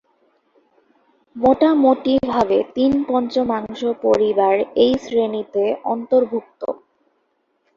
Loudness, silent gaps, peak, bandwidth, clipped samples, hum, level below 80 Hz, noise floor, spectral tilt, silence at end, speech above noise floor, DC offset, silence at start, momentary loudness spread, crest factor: -18 LUFS; none; -2 dBFS; 7.4 kHz; under 0.1%; none; -54 dBFS; -67 dBFS; -6.5 dB/octave; 1 s; 50 dB; under 0.1%; 1.35 s; 9 LU; 16 dB